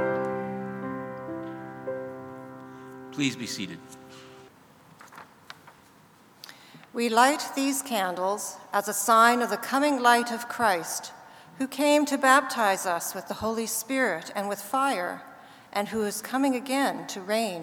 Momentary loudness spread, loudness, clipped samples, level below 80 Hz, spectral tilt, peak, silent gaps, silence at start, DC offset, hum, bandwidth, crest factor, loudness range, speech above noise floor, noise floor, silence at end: 23 LU; -26 LUFS; under 0.1%; -70 dBFS; -3 dB/octave; -4 dBFS; none; 0 s; under 0.1%; none; over 20 kHz; 24 dB; 12 LU; 30 dB; -56 dBFS; 0 s